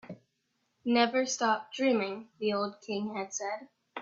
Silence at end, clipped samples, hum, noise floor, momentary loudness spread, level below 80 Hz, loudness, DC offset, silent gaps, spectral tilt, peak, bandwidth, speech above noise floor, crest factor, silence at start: 0 s; under 0.1%; none; -78 dBFS; 14 LU; -80 dBFS; -31 LUFS; under 0.1%; none; -3 dB/octave; -10 dBFS; 7.8 kHz; 48 dB; 22 dB; 0.05 s